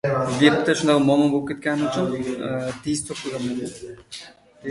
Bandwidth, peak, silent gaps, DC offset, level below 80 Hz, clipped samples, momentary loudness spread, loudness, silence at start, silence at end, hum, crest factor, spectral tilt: 11.5 kHz; 0 dBFS; none; under 0.1%; -56 dBFS; under 0.1%; 19 LU; -22 LUFS; 0.05 s; 0 s; none; 22 dB; -5 dB/octave